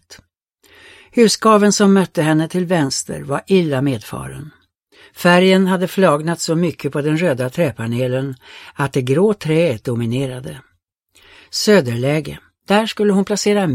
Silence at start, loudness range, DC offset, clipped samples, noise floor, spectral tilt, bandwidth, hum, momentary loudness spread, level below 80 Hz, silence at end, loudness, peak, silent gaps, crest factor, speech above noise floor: 0.1 s; 4 LU; under 0.1%; under 0.1%; -58 dBFS; -5.5 dB/octave; 16 kHz; none; 13 LU; -52 dBFS; 0 s; -16 LUFS; 0 dBFS; none; 16 dB; 42 dB